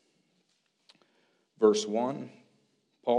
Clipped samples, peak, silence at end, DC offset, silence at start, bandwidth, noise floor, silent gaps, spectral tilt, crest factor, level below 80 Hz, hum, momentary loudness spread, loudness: under 0.1%; -10 dBFS; 0 s; under 0.1%; 1.6 s; 10.5 kHz; -74 dBFS; none; -4.5 dB/octave; 22 dB; -86 dBFS; none; 16 LU; -29 LUFS